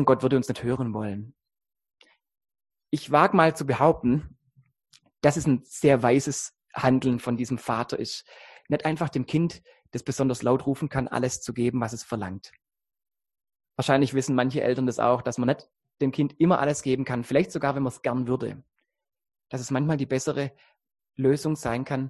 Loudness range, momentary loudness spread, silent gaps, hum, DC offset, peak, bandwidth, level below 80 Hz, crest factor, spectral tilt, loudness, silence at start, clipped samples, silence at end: 5 LU; 12 LU; none; none; under 0.1%; -4 dBFS; 12.5 kHz; -56 dBFS; 22 dB; -6 dB/octave; -25 LUFS; 0 s; under 0.1%; 0 s